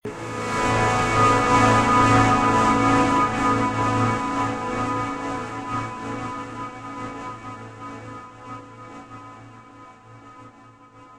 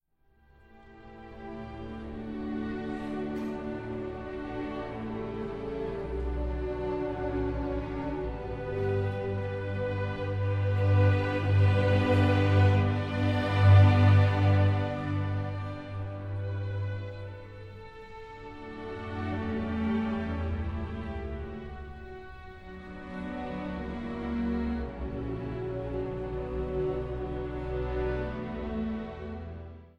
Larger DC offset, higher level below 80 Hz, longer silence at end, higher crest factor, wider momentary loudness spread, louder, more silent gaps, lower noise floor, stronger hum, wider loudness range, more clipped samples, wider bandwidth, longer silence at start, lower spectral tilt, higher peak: neither; about the same, -42 dBFS vs -44 dBFS; about the same, 0 s vs 0.1 s; about the same, 18 dB vs 20 dB; first, 22 LU vs 19 LU; first, -20 LUFS vs -30 LUFS; neither; second, -48 dBFS vs -65 dBFS; neither; first, 21 LU vs 14 LU; neither; first, 12.5 kHz vs 5.6 kHz; second, 0.05 s vs 0.75 s; second, -5.5 dB/octave vs -9 dB/octave; first, -4 dBFS vs -10 dBFS